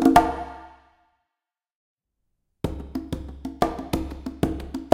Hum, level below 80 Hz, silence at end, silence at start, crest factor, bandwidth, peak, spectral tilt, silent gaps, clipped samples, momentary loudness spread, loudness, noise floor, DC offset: none; -40 dBFS; 0 s; 0 s; 26 dB; 16.5 kHz; 0 dBFS; -6.5 dB/octave; 1.75-1.97 s; under 0.1%; 13 LU; -27 LUFS; -86 dBFS; under 0.1%